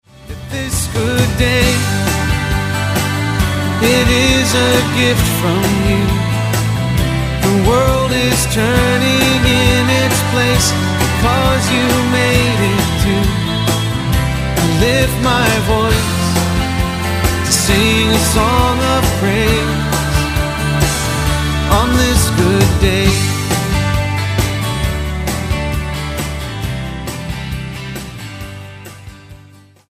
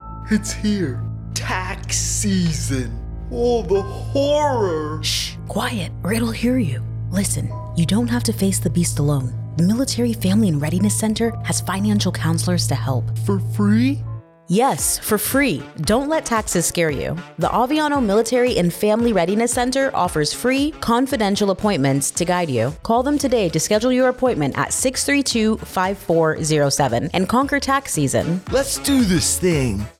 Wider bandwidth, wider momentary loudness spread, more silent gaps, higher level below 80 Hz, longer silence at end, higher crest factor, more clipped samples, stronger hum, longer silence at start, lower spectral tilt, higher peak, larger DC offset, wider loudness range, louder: about the same, 15.5 kHz vs 16.5 kHz; first, 10 LU vs 6 LU; neither; first, -24 dBFS vs -38 dBFS; first, 0.55 s vs 0.1 s; about the same, 14 dB vs 12 dB; neither; neither; first, 0.2 s vs 0 s; about the same, -4.5 dB/octave vs -4.5 dB/octave; first, 0 dBFS vs -6 dBFS; neither; first, 7 LU vs 3 LU; first, -14 LUFS vs -19 LUFS